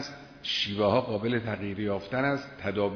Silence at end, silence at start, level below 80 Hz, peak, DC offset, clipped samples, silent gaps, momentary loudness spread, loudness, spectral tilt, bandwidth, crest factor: 0 s; 0 s; -60 dBFS; -12 dBFS; under 0.1%; under 0.1%; none; 8 LU; -29 LUFS; -6 dB/octave; 5.4 kHz; 18 dB